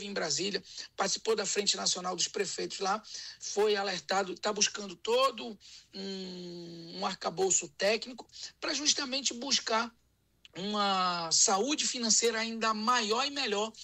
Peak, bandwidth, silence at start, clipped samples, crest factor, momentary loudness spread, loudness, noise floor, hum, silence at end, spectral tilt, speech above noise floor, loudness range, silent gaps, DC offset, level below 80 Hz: -10 dBFS; 16 kHz; 0 s; under 0.1%; 22 dB; 17 LU; -30 LUFS; -63 dBFS; none; 0 s; -1.5 dB/octave; 31 dB; 5 LU; none; under 0.1%; -74 dBFS